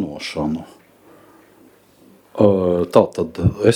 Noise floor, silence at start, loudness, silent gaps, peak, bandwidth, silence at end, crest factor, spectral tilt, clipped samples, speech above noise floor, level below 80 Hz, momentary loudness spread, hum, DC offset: -51 dBFS; 0 s; -18 LUFS; none; 0 dBFS; 16 kHz; 0 s; 20 dB; -7 dB/octave; under 0.1%; 34 dB; -44 dBFS; 11 LU; none; under 0.1%